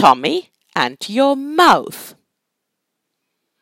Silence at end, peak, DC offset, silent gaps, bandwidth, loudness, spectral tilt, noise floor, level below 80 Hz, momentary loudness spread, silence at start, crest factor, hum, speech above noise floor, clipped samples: 1.55 s; 0 dBFS; under 0.1%; none; 17 kHz; -16 LUFS; -4 dB/octave; -77 dBFS; -62 dBFS; 14 LU; 0 s; 18 dB; none; 62 dB; under 0.1%